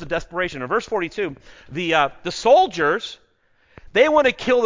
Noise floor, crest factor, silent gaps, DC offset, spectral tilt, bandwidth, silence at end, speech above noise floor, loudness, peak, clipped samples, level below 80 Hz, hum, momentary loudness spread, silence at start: -60 dBFS; 18 dB; none; under 0.1%; -4 dB/octave; 7.6 kHz; 0 s; 40 dB; -20 LUFS; -2 dBFS; under 0.1%; -50 dBFS; none; 12 LU; 0 s